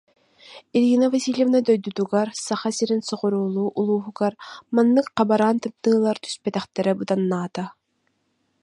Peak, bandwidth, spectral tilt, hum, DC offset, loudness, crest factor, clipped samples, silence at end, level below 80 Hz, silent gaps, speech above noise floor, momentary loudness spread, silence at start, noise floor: -4 dBFS; 11 kHz; -5.5 dB/octave; none; under 0.1%; -22 LUFS; 18 dB; under 0.1%; 0.9 s; -70 dBFS; none; 49 dB; 9 LU; 0.5 s; -71 dBFS